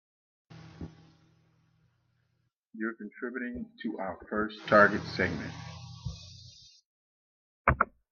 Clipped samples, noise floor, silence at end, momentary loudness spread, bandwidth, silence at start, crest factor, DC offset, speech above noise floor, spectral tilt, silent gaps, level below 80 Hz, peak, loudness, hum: under 0.1%; -77 dBFS; 0.25 s; 24 LU; 7 kHz; 0.5 s; 28 dB; under 0.1%; 47 dB; -6.5 dB/octave; 2.56-2.62 s, 6.86-7.65 s; -52 dBFS; -6 dBFS; -30 LUFS; none